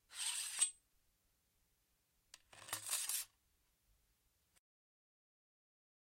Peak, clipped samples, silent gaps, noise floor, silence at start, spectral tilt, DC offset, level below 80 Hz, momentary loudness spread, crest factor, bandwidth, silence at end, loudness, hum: -22 dBFS; under 0.1%; none; -81 dBFS; 0.1 s; 2.5 dB/octave; under 0.1%; -84 dBFS; 13 LU; 28 dB; 16 kHz; 2.75 s; -40 LUFS; none